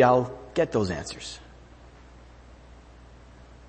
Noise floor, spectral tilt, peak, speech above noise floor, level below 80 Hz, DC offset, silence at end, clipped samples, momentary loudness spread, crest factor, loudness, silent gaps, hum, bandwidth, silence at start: -49 dBFS; -5.5 dB/octave; -6 dBFS; 25 dB; -50 dBFS; under 0.1%; 2.25 s; under 0.1%; 26 LU; 22 dB; -27 LUFS; none; none; 8.8 kHz; 0 s